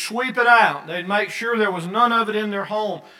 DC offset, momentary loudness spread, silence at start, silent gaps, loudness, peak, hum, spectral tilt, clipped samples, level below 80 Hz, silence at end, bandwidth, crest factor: under 0.1%; 10 LU; 0 s; none; -19 LUFS; 0 dBFS; none; -4 dB/octave; under 0.1%; -84 dBFS; 0.2 s; 16.5 kHz; 20 dB